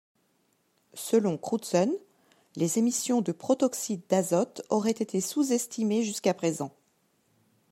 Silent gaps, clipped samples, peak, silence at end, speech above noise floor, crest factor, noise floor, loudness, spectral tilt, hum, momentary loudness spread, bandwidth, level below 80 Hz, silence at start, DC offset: none; under 0.1%; -10 dBFS; 1.05 s; 44 dB; 20 dB; -71 dBFS; -28 LUFS; -5 dB/octave; none; 8 LU; 16 kHz; -78 dBFS; 0.95 s; under 0.1%